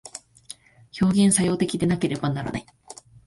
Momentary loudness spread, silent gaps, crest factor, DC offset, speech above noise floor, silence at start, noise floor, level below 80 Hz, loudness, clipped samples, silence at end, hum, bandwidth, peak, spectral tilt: 24 LU; none; 18 dB; under 0.1%; 25 dB; 0.05 s; -47 dBFS; -52 dBFS; -22 LUFS; under 0.1%; 0.35 s; none; 11.5 kHz; -6 dBFS; -5 dB/octave